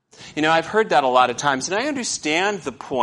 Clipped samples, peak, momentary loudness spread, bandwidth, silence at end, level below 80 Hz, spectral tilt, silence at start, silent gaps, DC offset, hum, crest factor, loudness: under 0.1%; -4 dBFS; 8 LU; 11.5 kHz; 0 s; -62 dBFS; -3 dB/octave; 0.2 s; none; under 0.1%; none; 18 dB; -20 LUFS